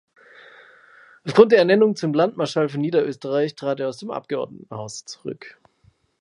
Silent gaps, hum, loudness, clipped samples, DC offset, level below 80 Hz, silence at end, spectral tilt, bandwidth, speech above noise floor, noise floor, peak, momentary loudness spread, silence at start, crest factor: none; none; -20 LUFS; under 0.1%; under 0.1%; -70 dBFS; 0.7 s; -6 dB/octave; 11 kHz; 40 dB; -60 dBFS; 0 dBFS; 19 LU; 1.25 s; 22 dB